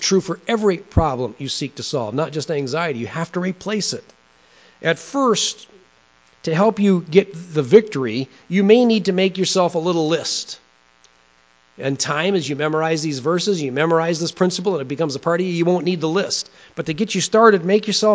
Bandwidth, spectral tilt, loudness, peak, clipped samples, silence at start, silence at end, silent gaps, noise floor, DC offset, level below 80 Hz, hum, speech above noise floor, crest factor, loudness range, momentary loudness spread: 8 kHz; -4.5 dB/octave; -19 LUFS; 0 dBFS; under 0.1%; 0 s; 0 s; none; -56 dBFS; under 0.1%; -42 dBFS; none; 37 dB; 20 dB; 6 LU; 10 LU